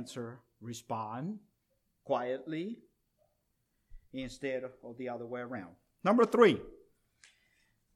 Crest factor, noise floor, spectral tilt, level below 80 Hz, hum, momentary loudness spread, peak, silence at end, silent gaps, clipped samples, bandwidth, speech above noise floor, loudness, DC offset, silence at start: 26 dB; -79 dBFS; -6 dB/octave; -66 dBFS; none; 21 LU; -8 dBFS; 1.2 s; none; under 0.1%; 14 kHz; 46 dB; -33 LUFS; under 0.1%; 0 s